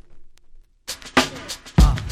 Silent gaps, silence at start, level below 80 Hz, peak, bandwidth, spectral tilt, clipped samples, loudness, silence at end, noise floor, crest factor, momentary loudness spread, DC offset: none; 0.15 s; -24 dBFS; -2 dBFS; 15.5 kHz; -4.5 dB/octave; under 0.1%; -21 LUFS; 0 s; -45 dBFS; 20 dB; 15 LU; under 0.1%